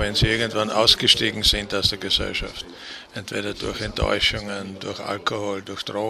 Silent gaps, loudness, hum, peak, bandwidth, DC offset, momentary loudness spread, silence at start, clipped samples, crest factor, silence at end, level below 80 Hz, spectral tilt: none; -21 LUFS; none; 0 dBFS; 15 kHz; under 0.1%; 16 LU; 0 s; under 0.1%; 24 dB; 0 s; -38 dBFS; -3 dB/octave